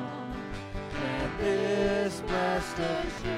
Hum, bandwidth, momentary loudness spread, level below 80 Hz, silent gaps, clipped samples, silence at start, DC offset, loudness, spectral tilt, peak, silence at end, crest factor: none; 15 kHz; 10 LU; -44 dBFS; none; under 0.1%; 0 s; under 0.1%; -31 LUFS; -5.5 dB/octave; -16 dBFS; 0 s; 14 dB